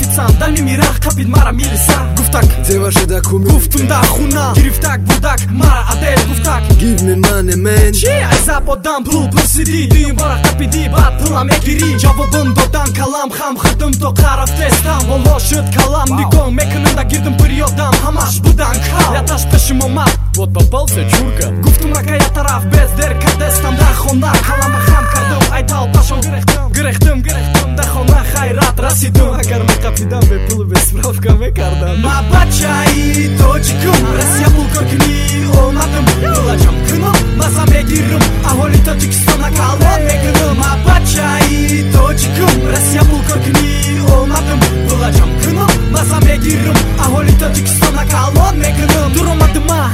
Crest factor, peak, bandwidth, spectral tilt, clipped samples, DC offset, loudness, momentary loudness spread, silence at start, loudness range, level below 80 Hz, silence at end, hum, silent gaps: 10 dB; 0 dBFS; 16.5 kHz; -5 dB/octave; 0.2%; under 0.1%; -11 LUFS; 3 LU; 0 s; 1 LU; -14 dBFS; 0 s; none; none